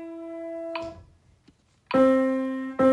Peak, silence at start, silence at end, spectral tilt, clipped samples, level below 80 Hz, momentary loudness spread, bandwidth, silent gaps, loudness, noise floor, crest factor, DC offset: -10 dBFS; 0 s; 0 s; -7 dB/octave; under 0.1%; -62 dBFS; 16 LU; 10 kHz; none; -25 LUFS; -61 dBFS; 16 dB; under 0.1%